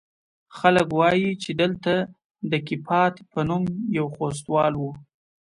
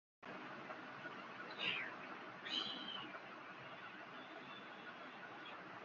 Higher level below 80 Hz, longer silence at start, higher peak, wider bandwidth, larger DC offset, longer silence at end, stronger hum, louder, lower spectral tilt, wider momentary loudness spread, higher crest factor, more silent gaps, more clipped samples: first, -58 dBFS vs under -90 dBFS; first, 0.5 s vs 0.2 s; first, -4 dBFS vs -26 dBFS; first, 11.5 kHz vs 7.2 kHz; neither; first, 0.45 s vs 0 s; neither; first, -23 LUFS vs -48 LUFS; first, -6 dB/octave vs 0 dB/octave; about the same, 9 LU vs 11 LU; about the same, 18 dB vs 22 dB; first, 2.25-2.30 s vs none; neither